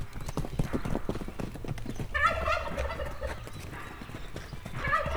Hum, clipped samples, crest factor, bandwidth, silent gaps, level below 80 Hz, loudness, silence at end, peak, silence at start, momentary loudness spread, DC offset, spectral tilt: none; under 0.1%; 20 dB; over 20 kHz; none; -40 dBFS; -34 LUFS; 0 s; -12 dBFS; 0 s; 15 LU; under 0.1%; -5.5 dB/octave